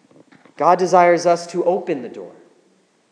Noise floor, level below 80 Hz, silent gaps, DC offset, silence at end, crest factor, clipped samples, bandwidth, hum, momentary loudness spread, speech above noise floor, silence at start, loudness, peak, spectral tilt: -59 dBFS; -84 dBFS; none; under 0.1%; 0.8 s; 18 dB; under 0.1%; 10.5 kHz; none; 15 LU; 42 dB; 0.6 s; -17 LUFS; 0 dBFS; -5 dB/octave